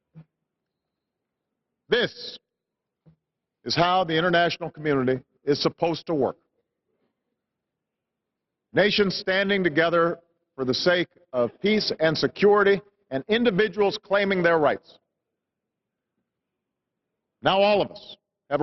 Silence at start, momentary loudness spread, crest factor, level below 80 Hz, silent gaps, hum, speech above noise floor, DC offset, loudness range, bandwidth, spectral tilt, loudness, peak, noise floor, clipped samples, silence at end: 0.15 s; 10 LU; 18 dB; -62 dBFS; none; none; 62 dB; under 0.1%; 7 LU; 6.2 kHz; -5.5 dB/octave; -23 LUFS; -8 dBFS; -85 dBFS; under 0.1%; 0 s